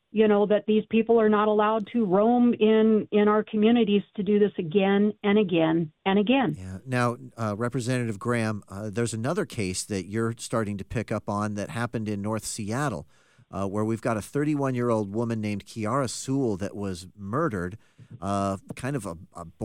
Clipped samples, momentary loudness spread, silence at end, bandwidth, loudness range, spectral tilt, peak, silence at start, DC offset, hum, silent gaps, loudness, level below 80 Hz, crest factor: under 0.1%; 11 LU; 0 s; 13 kHz; 8 LU; -6 dB/octave; -10 dBFS; 0.15 s; under 0.1%; none; none; -26 LUFS; -60 dBFS; 16 dB